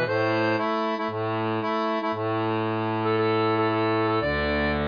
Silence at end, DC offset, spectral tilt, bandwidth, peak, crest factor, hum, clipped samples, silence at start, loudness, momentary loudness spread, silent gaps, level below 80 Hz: 0 s; under 0.1%; -8 dB/octave; 5.2 kHz; -12 dBFS; 12 dB; none; under 0.1%; 0 s; -25 LUFS; 4 LU; none; -44 dBFS